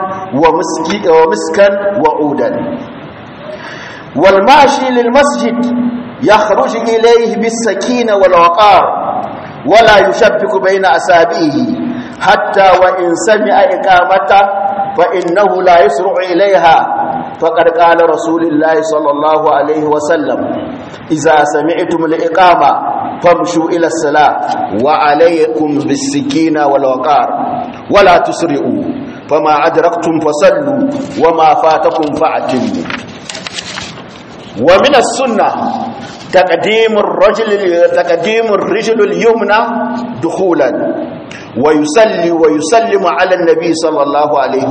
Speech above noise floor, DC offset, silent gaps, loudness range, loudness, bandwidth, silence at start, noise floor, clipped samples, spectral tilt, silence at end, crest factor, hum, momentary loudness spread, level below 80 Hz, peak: 20 dB; under 0.1%; none; 3 LU; -10 LUFS; 9 kHz; 0 s; -29 dBFS; 0.4%; -4.5 dB/octave; 0 s; 10 dB; none; 12 LU; -44 dBFS; 0 dBFS